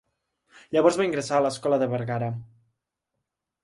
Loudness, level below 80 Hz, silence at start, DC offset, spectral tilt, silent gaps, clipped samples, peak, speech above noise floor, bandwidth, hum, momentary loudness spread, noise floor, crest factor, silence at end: -25 LUFS; -66 dBFS; 0.7 s; under 0.1%; -6 dB/octave; none; under 0.1%; -6 dBFS; 59 dB; 11.5 kHz; none; 9 LU; -83 dBFS; 20 dB; 1.2 s